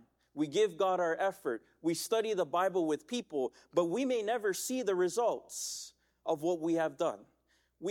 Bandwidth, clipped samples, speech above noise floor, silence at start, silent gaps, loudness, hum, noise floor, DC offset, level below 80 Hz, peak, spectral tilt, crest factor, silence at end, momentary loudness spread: 18 kHz; under 0.1%; 41 dB; 0.35 s; none; -34 LUFS; none; -74 dBFS; under 0.1%; -78 dBFS; -18 dBFS; -4 dB/octave; 16 dB; 0 s; 8 LU